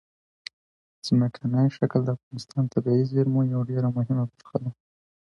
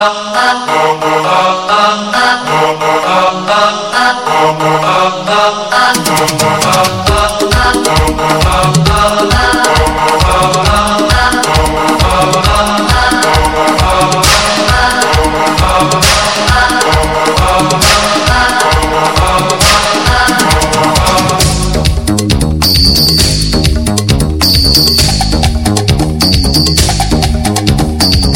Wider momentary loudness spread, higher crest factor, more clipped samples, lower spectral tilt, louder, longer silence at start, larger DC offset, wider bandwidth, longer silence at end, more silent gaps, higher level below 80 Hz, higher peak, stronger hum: first, 14 LU vs 4 LU; first, 18 dB vs 10 dB; second, under 0.1% vs 0.2%; first, -8.5 dB/octave vs -3.5 dB/octave; second, -25 LUFS vs -9 LUFS; first, 1.05 s vs 0 s; second, under 0.1% vs 1%; second, 11 kHz vs 17.5 kHz; first, 0.6 s vs 0 s; first, 2.23-2.31 s vs none; second, -64 dBFS vs -18 dBFS; second, -8 dBFS vs 0 dBFS; neither